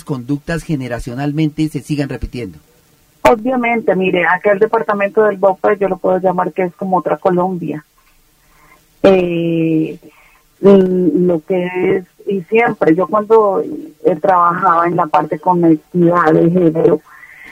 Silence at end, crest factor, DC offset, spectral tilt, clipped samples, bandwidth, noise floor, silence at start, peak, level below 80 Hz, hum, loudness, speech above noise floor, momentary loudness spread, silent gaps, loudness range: 0 s; 14 dB; under 0.1%; -8 dB/octave; under 0.1%; 16 kHz; -52 dBFS; 0.1 s; 0 dBFS; -42 dBFS; none; -14 LUFS; 38 dB; 10 LU; none; 5 LU